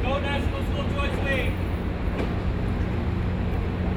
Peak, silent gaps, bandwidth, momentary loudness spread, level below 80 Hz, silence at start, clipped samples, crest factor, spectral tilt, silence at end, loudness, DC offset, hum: -12 dBFS; none; 15.5 kHz; 3 LU; -30 dBFS; 0 s; under 0.1%; 14 dB; -7.5 dB/octave; 0 s; -27 LUFS; under 0.1%; none